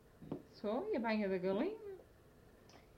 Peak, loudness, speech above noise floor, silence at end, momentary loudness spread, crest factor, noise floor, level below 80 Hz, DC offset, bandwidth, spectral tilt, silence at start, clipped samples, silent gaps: -24 dBFS; -40 LUFS; 26 dB; 0.15 s; 14 LU; 16 dB; -64 dBFS; -70 dBFS; under 0.1%; 15.5 kHz; -7.5 dB/octave; 0.2 s; under 0.1%; none